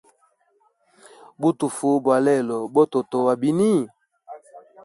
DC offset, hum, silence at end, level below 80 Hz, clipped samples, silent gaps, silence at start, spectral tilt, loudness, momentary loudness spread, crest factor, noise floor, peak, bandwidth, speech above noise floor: under 0.1%; none; 0.25 s; -70 dBFS; under 0.1%; none; 1.4 s; -6.5 dB/octave; -21 LUFS; 6 LU; 18 dB; -64 dBFS; -6 dBFS; 11.5 kHz; 45 dB